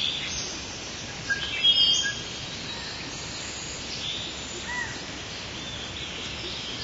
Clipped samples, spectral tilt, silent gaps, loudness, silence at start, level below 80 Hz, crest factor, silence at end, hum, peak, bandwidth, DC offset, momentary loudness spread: under 0.1%; -1 dB/octave; none; -27 LUFS; 0 s; -50 dBFS; 20 dB; 0 s; none; -10 dBFS; 8 kHz; under 0.1%; 14 LU